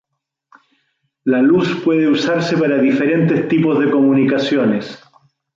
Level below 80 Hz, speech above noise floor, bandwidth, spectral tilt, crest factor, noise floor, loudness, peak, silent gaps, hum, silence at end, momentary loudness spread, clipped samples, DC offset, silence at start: -60 dBFS; 63 dB; 7.4 kHz; -7 dB/octave; 12 dB; -77 dBFS; -15 LUFS; -4 dBFS; none; none; 0.6 s; 5 LU; under 0.1%; under 0.1%; 1.25 s